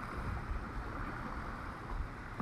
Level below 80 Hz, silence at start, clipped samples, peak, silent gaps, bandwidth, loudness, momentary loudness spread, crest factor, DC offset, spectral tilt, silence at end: -44 dBFS; 0 s; under 0.1%; -28 dBFS; none; 13 kHz; -43 LUFS; 3 LU; 14 dB; under 0.1%; -7 dB/octave; 0 s